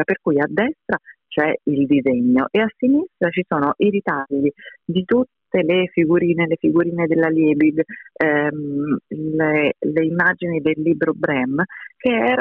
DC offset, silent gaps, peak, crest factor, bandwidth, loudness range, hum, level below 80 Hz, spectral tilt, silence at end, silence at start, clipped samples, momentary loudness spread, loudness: under 0.1%; none; -4 dBFS; 14 dB; 4 kHz; 2 LU; none; -60 dBFS; -9.5 dB/octave; 0 s; 0 s; under 0.1%; 7 LU; -19 LUFS